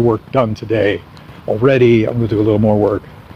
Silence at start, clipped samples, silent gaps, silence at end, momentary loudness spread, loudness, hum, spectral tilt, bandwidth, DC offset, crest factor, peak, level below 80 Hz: 0 s; under 0.1%; none; 0.15 s; 11 LU; -15 LUFS; none; -8.5 dB/octave; 6.6 kHz; under 0.1%; 14 dB; 0 dBFS; -42 dBFS